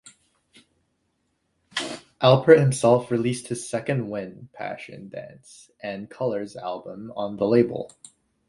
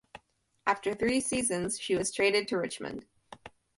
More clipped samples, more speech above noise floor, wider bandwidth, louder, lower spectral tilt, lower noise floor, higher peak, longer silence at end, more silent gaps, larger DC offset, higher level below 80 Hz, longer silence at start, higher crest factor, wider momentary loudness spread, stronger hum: neither; first, 49 dB vs 36 dB; about the same, 11.5 kHz vs 11.5 kHz; first, -23 LUFS vs -30 LUFS; first, -6 dB/octave vs -3 dB/octave; first, -73 dBFS vs -66 dBFS; first, 0 dBFS vs -12 dBFS; first, 0.6 s vs 0.3 s; neither; neither; about the same, -62 dBFS vs -62 dBFS; first, 1.75 s vs 0.15 s; about the same, 24 dB vs 20 dB; about the same, 21 LU vs 19 LU; neither